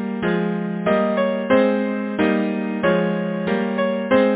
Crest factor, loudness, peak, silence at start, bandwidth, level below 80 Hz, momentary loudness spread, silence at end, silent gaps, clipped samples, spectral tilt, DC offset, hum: 16 dB; -20 LUFS; -4 dBFS; 0 s; 4 kHz; -54 dBFS; 6 LU; 0 s; none; under 0.1%; -11 dB/octave; under 0.1%; none